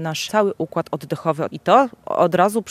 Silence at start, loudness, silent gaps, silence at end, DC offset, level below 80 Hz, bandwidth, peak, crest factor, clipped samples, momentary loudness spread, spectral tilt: 0 s; -20 LUFS; none; 0 s; under 0.1%; -64 dBFS; 15.5 kHz; 0 dBFS; 18 dB; under 0.1%; 9 LU; -5.5 dB/octave